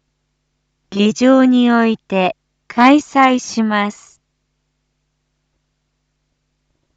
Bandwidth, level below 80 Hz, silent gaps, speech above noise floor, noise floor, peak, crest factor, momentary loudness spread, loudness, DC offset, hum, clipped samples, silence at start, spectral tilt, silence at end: 8 kHz; -64 dBFS; none; 56 dB; -69 dBFS; 0 dBFS; 16 dB; 12 LU; -14 LUFS; under 0.1%; none; under 0.1%; 0.9 s; -5 dB/octave; 3.05 s